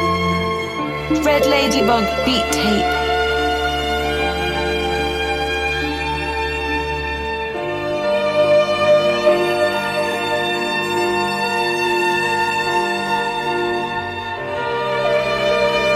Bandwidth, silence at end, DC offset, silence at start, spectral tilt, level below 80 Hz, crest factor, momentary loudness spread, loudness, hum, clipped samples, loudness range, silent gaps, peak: 16 kHz; 0 s; under 0.1%; 0 s; -4 dB/octave; -36 dBFS; 16 dB; 7 LU; -18 LUFS; none; under 0.1%; 3 LU; none; -2 dBFS